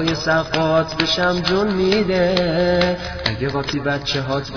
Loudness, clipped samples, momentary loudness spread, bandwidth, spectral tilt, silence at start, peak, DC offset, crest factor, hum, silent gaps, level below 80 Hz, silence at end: -18 LUFS; under 0.1%; 5 LU; 5.4 kHz; -5.5 dB/octave; 0 s; 0 dBFS; under 0.1%; 18 dB; none; none; -38 dBFS; 0 s